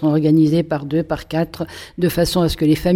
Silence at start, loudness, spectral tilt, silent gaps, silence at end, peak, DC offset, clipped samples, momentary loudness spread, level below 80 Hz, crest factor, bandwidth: 0 s; -18 LUFS; -6.5 dB/octave; none; 0 s; -4 dBFS; under 0.1%; under 0.1%; 9 LU; -36 dBFS; 12 dB; 16.5 kHz